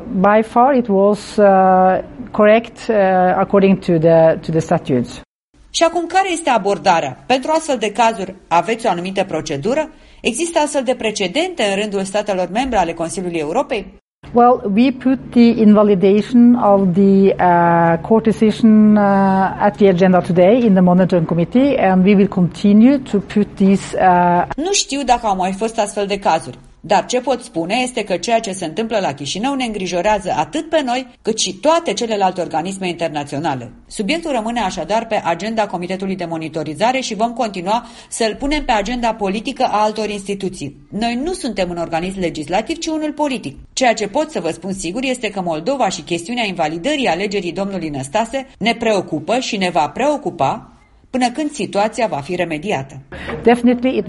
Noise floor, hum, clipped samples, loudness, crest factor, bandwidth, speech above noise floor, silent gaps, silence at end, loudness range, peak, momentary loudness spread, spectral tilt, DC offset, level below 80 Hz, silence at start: -44 dBFS; none; under 0.1%; -16 LUFS; 16 dB; 11.5 kHz; 28 dB; 5.27-5.53 s, 14.01-14.22 s; 0 s; 7 LU; 0 dBFS; 10 LU; -5.5 dB/octave; under 0.1%; -44 dBFS; 0 s